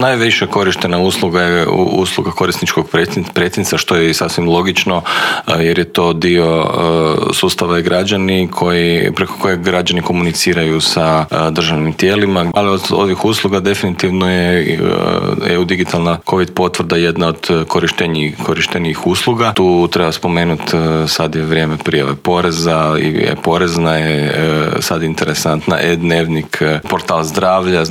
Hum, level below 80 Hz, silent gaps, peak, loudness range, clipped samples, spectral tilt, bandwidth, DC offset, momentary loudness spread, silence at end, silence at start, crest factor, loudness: none; -46 dBFS; none; 0 dBFS; 1 LU; under 0.1%; -5 dB/octave; 16.5 kHz; under 0.1%; 3 LU; 0 s; 0 s; 12 dB; -13 LUFS